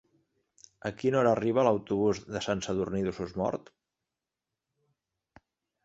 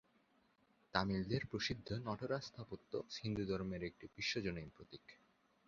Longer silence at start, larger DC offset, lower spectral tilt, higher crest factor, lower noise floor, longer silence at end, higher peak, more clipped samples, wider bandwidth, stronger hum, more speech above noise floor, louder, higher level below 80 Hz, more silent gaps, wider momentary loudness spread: about the same, 0.85 s vs 0.95 s; neither; first, -6 dB/octave vs -4 dB/octave; second, 22 dB vs 28 dB; first, -89 dBFS vs -76 dBFS; first, 2.25 s vs 0.5 s; first, -10 dBFS vs -18 dBFS; neither; first, 8 kHz vs 7.2 kHz; neither; first, 60 dB vs 33 dB; first, -29 LUFS vs -43 LUFS; about the same, -60 dBFS vs -64 dBFS; neither; second, 8 LU vs 13 LU